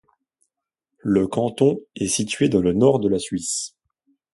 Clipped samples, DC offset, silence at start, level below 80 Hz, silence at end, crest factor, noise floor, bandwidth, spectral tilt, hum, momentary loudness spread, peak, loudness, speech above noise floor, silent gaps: under 0.1%; under 0.1%; 1.05 s; -52 dBFS; 0.65 s; 18 dB; -82 dBFS; 11.5 kHz; -5 dB/octave; none; 9 LU; -4 dBFS; -21 LUFS; 62 dB; none